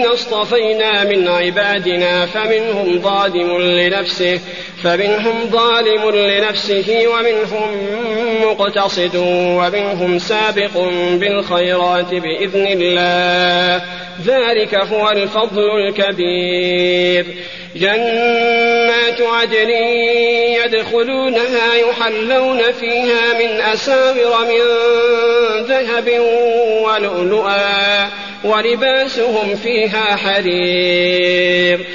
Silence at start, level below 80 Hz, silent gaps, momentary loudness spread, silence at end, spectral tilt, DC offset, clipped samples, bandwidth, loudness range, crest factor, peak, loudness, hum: 0 s; -56 dBFS; none; 4 LU; 0 s; -1.5 dB/octave; 0.5%; under 0.1%; 7.4 kHz; 2 LU; 12 dB; -2 dBFS; -14 LUFS; none